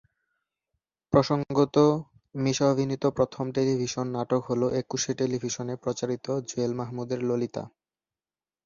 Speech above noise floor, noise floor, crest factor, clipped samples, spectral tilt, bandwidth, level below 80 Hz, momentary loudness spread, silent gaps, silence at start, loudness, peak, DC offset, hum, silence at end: over 63 dB; under -90 dBFS; 20 dB; under 0.1%; -6 dB/octave; 7.4 kHz; -60 dBFS; 8 LU; none; 1.1 s; -27 LUFS; -6 dBFS; under 0.1%; none; 1 s